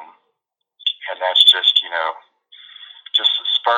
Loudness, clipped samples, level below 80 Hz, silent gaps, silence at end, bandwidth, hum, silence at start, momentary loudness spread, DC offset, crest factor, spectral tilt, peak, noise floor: -15 LUFS; under 0.1%; -72 dBFS; none; 0 s; 19 kHz; none; 0 s; 14 LU; under 0.1%; 18 dB; 1.5 dB/octave; -2 dBFS; -76 dBFS